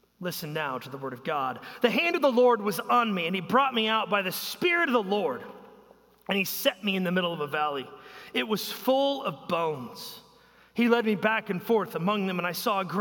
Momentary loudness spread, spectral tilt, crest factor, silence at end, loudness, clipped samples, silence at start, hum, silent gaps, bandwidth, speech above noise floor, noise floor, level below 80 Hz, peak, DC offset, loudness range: 12 LU; -4.5 dB/octave; 18 dB; 0 s; -27 LUFS; under 0.1%; 0.2 s; none; none; 17 kHz; 30 dB; -58 dBFS; -74 dBFS; -8 dBFS; under 0.1%; 5 LU